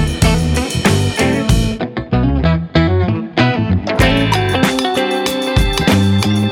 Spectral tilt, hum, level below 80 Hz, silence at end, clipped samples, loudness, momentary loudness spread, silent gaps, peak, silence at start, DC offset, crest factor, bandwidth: -5.5 dB/octave; none; -24 dBFS; 0 s; under 0.1%; -14 LUFS; 4 LU; none; -2 dBFS; 0 s; under 0.1%; 12 dB; 17 kHz